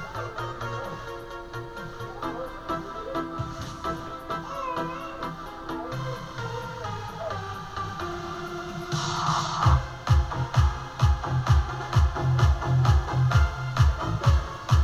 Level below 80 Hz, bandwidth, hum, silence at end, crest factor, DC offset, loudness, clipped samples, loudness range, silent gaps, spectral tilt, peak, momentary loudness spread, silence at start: -32 dBFS; 13.5 kHz; none; 0 s; 18 dB; under 0.1%; -28 LUFS; under 0.1%; 10 LU; none; -6 dB/octave; -8 dBFS; 12 LU; 0 s